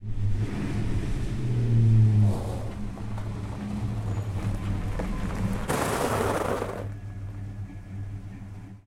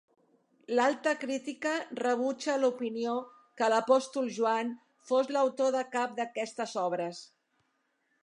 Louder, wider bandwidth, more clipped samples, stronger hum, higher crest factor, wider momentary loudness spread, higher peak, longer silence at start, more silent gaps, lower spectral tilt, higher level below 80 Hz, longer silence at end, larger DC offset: first, -28 LUFS vs -31 LUFS; first, 15.5 kHz vs 11 kHz; neither; neither; about the same, 16 dB vs 20 dB; first, 16 LU vs 8 LU; about the same, -10 dBFS vs -12 dBFS; second, 0 s vs 0.7 s; neither; first, -7 dB/octave vs -3.5 dB/octave; first, -36 dBFS vs -88 dBFS; second, 0.05 s vs 0.95 s; neither